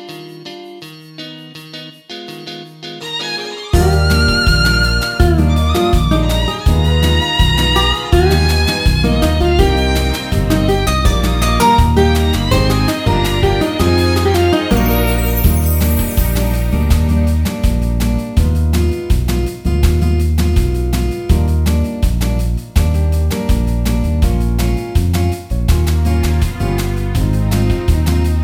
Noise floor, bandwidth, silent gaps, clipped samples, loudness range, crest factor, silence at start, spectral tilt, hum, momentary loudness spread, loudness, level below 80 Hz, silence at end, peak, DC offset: -34 dBFS; over 20 kHz; none; under 0.1%; 3 LU; 14 dB; 0 s; -5.5 dB/octave; none; 11 LU; -14 LUFS; -16 dBFS; 0 s; 0 dBFS; under 0.1%